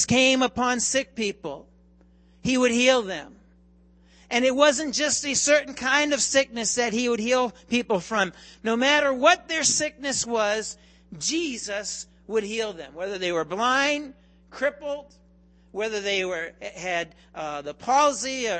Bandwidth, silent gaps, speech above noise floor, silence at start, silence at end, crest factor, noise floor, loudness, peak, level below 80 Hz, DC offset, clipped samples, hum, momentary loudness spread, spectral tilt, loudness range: 8.8 kHz; none; 32 dB; 0 s; 0 s; 20 dB; -56 dBFS; -24 LUFS; -4 dBFS; -58 dBFS; under 0.1%; under 0.1%; none; 14 LU; -2 dB/octave; 6 LU